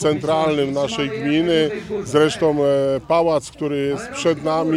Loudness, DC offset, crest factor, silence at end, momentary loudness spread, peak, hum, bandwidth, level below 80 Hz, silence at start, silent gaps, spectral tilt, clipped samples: -19 LUFS; under 0.1%; 16 dB; 0 s; 5 LU; -4 dBFS; none; 13 kHz; -50 dBFS; 0 s; none; -5.5 dB/octave; under 0.1%